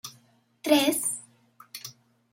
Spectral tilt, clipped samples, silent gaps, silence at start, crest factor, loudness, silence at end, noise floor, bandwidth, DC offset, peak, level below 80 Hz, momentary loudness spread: -2 dB/octave; under 0.1%; none; 0.05 s; 22 dB; -25 LUFS; 0.4 s; -62 dBFS; 16.5 kHz; under 0.1%; -8 dBFS; -82 dBFS; 22 LU